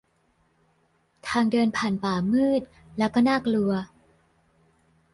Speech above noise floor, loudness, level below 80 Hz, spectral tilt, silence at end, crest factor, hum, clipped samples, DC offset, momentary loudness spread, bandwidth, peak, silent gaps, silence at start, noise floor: 44 dB; -24 LUFS; -58 dBFS; -6 dB/octave; 1.3 s; 16 dB; none; under 0.1%; under 0.1%; 10 LU; 11.5 kHz; -10 dBFS; none; 1.25 s; -67 dBFS